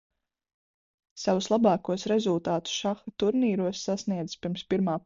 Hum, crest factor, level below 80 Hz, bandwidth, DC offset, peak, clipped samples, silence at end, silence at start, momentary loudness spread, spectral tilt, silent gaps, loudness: none; 16 dB; -64 dBFS; 7.6 kHz; under 0.1%; -12 dBFS; under 0.1%; 0.05 s; 1.15 s; 9 LU; -5.5 dB/octave; none; -28 LUFS